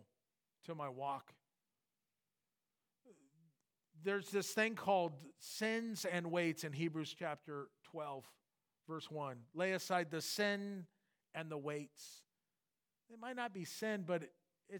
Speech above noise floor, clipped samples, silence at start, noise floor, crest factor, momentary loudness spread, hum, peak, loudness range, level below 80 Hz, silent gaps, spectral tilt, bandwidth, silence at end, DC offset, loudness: over 48 dB; under 0.1%; 0.65 s; under -90 dBFS; 22 dB; 15 LU; none; -22 dBFS; 11 LU; under -90 dBFS; none; -4.5 dB/octave; 19 kHz; 0 s; under 0.1%; -42 LUFS